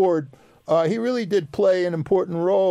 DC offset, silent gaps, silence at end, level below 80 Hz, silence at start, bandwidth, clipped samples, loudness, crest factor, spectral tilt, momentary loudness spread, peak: under 0.1%; none; 0 s; -62 dBFS; 0 s; 11 kHz; under 0.1%; -22 LUFS; 12 dB; -7 dB/octave; 6 LU; -8 dBFS